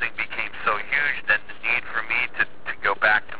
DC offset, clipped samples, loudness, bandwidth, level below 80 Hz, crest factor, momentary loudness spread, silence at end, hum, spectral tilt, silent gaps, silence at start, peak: 3%; under 0.1%; -23 LUFS; 4 kHz; -56 dBFS; 18 dB; 6 LU; 0 s; none; 0.5 dB/octave; none; 0 s; -6 dBFS